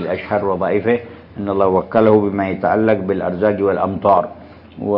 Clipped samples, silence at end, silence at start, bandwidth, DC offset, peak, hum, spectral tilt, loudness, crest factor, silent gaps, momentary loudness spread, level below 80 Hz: under 0.1%; 0 s; 0 s; 5.6 kHz; under 0.1%; 0 dBFS; none; -11 dB/octave; -17 LUFS; 16 dB; none; 8 LU; -54 dBFS